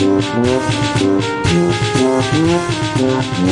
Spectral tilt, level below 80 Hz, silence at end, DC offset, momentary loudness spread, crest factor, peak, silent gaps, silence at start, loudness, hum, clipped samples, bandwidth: -5.5 dB/octave; -40 dBFS; 0 s; under 0.1%; 2 LU; 12 dB; -2 dBFS; none; 0 s; -15 LUFS; none; under 0.1%; 11.5 kHz